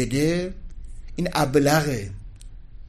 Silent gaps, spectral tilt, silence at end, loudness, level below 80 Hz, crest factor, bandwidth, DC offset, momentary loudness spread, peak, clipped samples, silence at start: none; -5.5 dB/octave; 0 s; -23 LUFS; -38 dBFS; 18 dB; 15 kHz; under 0.1%; 23 LU; -6 dBFS; under 0.1%; 0 s